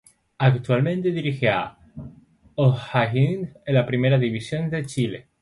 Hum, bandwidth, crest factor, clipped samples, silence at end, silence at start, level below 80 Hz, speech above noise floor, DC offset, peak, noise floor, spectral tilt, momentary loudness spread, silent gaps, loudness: none; 11.5 kHz; 18 dB; under 0.1%; 0.2 s; 0.4 s; -56 dBFS; 30 dB; under 0.1%; -4 dBFS; -51 dBFS; -7.5 dB/octave; 11 LU; none; -22 LUFS